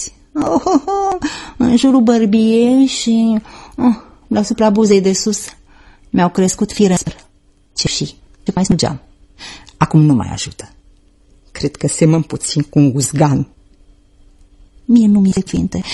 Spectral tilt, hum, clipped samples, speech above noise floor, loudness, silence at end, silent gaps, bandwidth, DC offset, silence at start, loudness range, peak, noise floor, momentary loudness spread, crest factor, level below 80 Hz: -5.5 dB/octave; none; under 0.1%; 37 dB; -14 LUFS; 0 s; none; 12.5 kHz; under 0.1%; 0 s; 5 LU; 0 dBFS; -50 dBFS; 15 LU; 14 dB; -40 dBFS